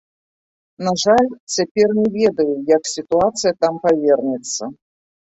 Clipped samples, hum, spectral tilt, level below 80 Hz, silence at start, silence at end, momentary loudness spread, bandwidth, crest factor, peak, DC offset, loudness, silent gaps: under 0.1%; none; -4 dB/octave; -56 dBFS; 0.8 s; 0.5 s; 8 LU; 8.2 kHz; 16 dB; -2 dBFS; under 0.1%; -18 LUFS; 1.40-1.47 s, 1.71-1.75 s